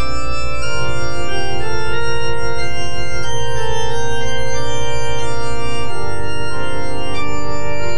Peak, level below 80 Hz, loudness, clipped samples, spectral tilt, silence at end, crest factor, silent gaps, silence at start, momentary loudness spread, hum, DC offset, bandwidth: -4 dBFS; -32 dBFS; -23 LUFS; under 0.1%; -4 dB/octave; 0 s; 12 dB; none; 0 s; 3 LU; none; 40%; 10 kHz